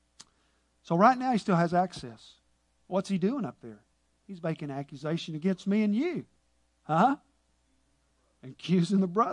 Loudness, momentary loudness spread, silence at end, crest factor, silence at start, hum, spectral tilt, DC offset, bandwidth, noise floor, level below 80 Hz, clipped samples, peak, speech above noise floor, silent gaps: -29 LUFS; 16 LU; 0 s; 22 dB; 0.9 s; none; -7 dB/octave; under 0.1%; 10.5 kHz; -71 dBFS; -70 dBFS; under 0.1%; -8 dBFS; 43 dB; none